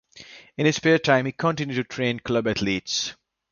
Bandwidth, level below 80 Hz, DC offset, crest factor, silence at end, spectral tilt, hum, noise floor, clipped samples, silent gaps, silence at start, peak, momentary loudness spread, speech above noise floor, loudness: 7.2 kHz; -56 dBFS; under 0.1%; 20 dB; 0.4 s; -4.5 dB/octave; none; -47 dBFS; under 0.1%; none; 0.15 s; -4 dBFS; 12 LU; 24 dB; -23 LUFS